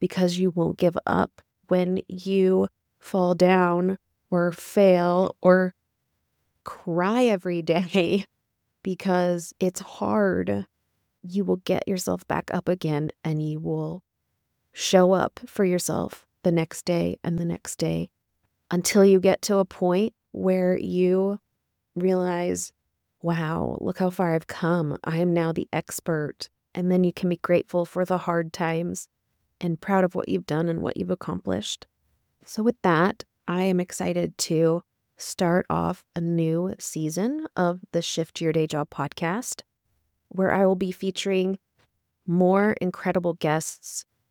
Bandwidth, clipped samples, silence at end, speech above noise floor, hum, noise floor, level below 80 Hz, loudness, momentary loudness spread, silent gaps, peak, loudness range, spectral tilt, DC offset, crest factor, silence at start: 18.5 kHz; under 0.1%; 0.3 s; 54 dB; none; -78 dBFS; -60 dBFS; -25 LUFS; 11 LU; none; -4 dBFS; 5 LU; -6 dB/octave; under 0.1%; 20 dB; 0 s